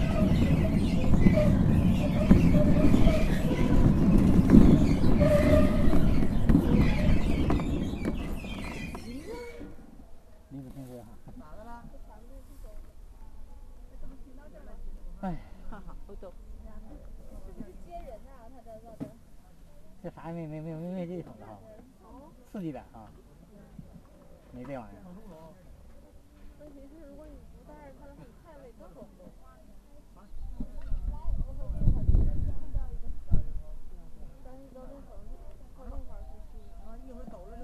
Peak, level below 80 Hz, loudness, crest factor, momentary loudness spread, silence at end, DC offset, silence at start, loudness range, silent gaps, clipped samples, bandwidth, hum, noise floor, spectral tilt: -2 dBFS; -32 dBFS; -26 LUFS; 24 dB; 27 LU; 0 s; under 0.1%; 0 s; 26 LU; none; under 0.1%; 13 kHz; none; -52 dBFS; -8.5 dB/octave